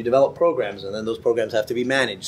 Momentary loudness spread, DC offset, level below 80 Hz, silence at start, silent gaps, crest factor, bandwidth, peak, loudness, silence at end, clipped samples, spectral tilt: 9 LU; under 0.1%; -58 dBFS; 0 s; none; 18 dB; 14.5 kHz; -4 dBFS; -22 LUFS; 0 s; under 0.1%; -4.5 dB/octave